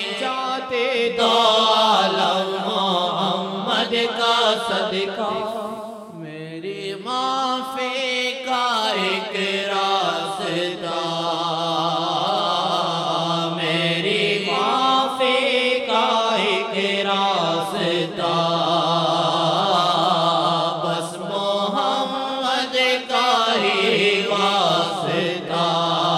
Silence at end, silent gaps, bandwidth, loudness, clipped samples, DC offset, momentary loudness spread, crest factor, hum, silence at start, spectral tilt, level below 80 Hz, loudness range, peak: 0 s; none; 15.5 kHz; -20 LUFS; under 0.1%; under 0.1%; 7 LU; 16 dB; none; 0 s; -4 dB/octave; -70 dBFS; 4 LU; -4 dBFS